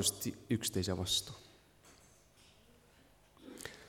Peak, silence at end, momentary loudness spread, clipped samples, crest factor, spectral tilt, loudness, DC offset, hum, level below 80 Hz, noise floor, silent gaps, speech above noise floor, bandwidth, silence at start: -18 dBFS; 0 s; 21 LU; under 0.1%; 24 dB; -3 dB/octave; -36 LUFS; under 0.1%; none; -64 dBFS; -65 dBFS; none; 29 dB; 18 kHz; 0 s